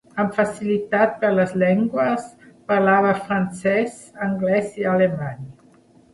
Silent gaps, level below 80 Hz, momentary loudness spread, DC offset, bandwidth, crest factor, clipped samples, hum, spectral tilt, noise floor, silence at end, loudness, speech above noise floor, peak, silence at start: none; -60 dBFS; 11 LU; under 0.1%; 11.5 kHz; 18 dB; under 0.1%; none; -7 dB/octave; -52 dBFS; 0.6 s; -20 LUFS; 33 dB; -4 dBFS; 0.15 s